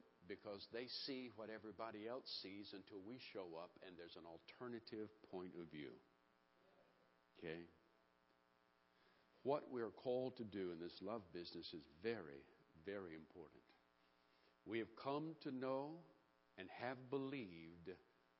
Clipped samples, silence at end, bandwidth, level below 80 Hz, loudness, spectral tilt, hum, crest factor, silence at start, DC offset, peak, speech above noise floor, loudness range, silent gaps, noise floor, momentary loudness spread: under 0.1%; 0.4 s; 5.6 kHz; -84 dBFS; -52 LUFS; -4 dB/octave; none; 22 dB; 0 s; under 0.1%; -30 dBFS; 28 dB; 8 LU; none; -79 dBFS; 13 LU